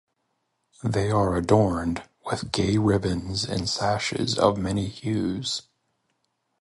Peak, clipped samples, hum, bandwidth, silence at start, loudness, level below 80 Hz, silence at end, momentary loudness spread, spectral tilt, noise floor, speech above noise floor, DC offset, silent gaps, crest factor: -6 dBFS; under 0.1%; none; 11.5 kHz; 0.85 s; -25 LUFS; -44 dBFS; 1 s; 10 LU; -5.5 dB/octave; -75 dBFS; 51 dB; under 0.1%; none; 20 dB